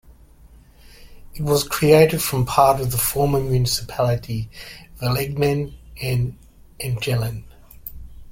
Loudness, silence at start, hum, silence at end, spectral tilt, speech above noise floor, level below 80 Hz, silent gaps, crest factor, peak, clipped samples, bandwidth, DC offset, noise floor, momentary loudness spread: -20 LUFS; 1 s; none; 0 s; -5 dB/octave; 28 dB; -40 dBFS; none; 20 dB; -2 dBFS; under 0.1%; 16.5 kHz; under 0.1%; -48 dBFS; 20 LU